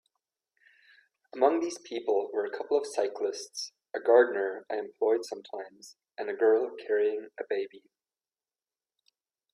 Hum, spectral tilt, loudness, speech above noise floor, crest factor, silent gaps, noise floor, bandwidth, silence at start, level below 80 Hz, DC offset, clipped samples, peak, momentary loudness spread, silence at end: none; -2.5 dB/octave; -29 LUFS; over 61 dB; 22 dB; none; under -90 dBFS; 11 kHz; 1.35 s; -84 dBFS; under 0.1%; under 0.1%; -10 dBFS; 15 LU; 1.75 s